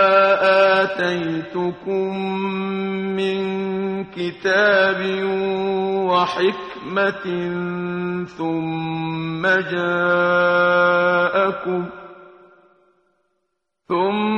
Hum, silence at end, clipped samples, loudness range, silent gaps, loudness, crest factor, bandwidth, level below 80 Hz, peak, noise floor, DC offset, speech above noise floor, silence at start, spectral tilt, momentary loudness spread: none; 0 s; under 0.1%; 5 LU; none; -19 LUFS; 16 dB; 9 kHz; -60 dBFS; -4 dBFS; -75 dBFS; under 0.1%; 55 dB; 0 s; -6.5 dB/octave; 10 LU